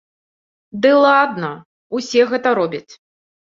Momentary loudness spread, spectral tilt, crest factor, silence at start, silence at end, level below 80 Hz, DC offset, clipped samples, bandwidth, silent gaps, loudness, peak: 18 LU; -5 dB/octave; 16 dB; 0.75 s; 0.55 s; -66 dBFS; under 0.1%; under 0.1%; 7.6 kHz; 1.65-1.90 s; -16 LUFS; -2 dBFS